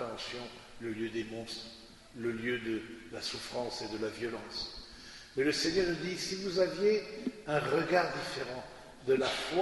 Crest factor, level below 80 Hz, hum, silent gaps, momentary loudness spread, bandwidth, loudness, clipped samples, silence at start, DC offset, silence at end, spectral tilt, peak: 22 dB; -60 dBFS; none; none; 15 LU; 11.5 kHz; -34 LUFS; under 0.1%; 0 s; under 0.1%; 0 s; -4 dB/octave; -14 dBFS